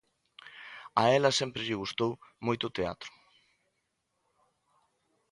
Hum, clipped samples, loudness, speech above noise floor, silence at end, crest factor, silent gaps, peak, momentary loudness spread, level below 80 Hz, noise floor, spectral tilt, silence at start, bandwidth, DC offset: none; under 0.1%; -30 LUFS; 50 dB; 2.25 s; 24 dB; none; -10 dBFS; 21 LU; -66 dBFS; -80 dBFS; -4 dB/octave; 0.45 s; 11.5 kHz; under 0.1%